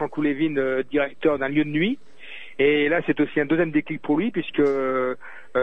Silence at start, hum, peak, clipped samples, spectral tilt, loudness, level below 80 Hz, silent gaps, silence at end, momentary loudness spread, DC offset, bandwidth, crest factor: 0 s; none; -8 dBFS; under 0.1%; -8 dB/octave; -23 LUFS; -54 dBFS; none; 0 s; 8 LU; 1%; 3.9 kHz; 14 dB